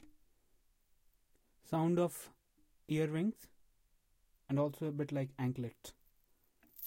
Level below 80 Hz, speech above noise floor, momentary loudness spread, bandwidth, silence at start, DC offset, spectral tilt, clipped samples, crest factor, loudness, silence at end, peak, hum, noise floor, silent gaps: -74 dBFS; 37 dB; 19 LU; 16.5 kHz; 1.65 s; under 0.1%; -7 dB/octave; under 0.1%; 18 dB; -38 LUFS; 0 s; -22 dBFS; none; -73 dBFS; none